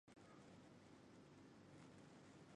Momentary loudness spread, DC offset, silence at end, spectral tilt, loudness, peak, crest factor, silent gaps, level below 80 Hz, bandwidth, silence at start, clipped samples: 2 LU; under 0.1%; 0 s; -5.5 dB/octave; -65 LUFS; -50 dBFS; 16 dB; none; -86 dBFS; 10.5 kHz; 0.05 s; under 0.1%